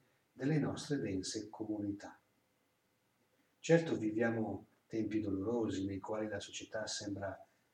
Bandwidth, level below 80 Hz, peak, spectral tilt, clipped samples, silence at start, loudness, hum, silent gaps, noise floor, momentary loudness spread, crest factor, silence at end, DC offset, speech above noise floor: 11.5 kHz; -78 dBFS; -16 dBFS; -5.5 dB/octave; under 0.1%; 0.35 s; -38 LUFS; none; none; -78 dBFS; 12 LU; 24 dB; 0.3 s; under 0.1%; 41 dB